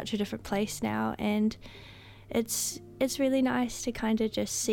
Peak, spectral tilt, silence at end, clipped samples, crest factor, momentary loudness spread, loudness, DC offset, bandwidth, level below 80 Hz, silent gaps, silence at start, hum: -16 dBFS; -4 dB/octave; 0 s; under 0.1%; 16 dB; 15 LU; -30 LUFS; under 0.1%; 17 kHz; -54 dBFS; none; 0 s; none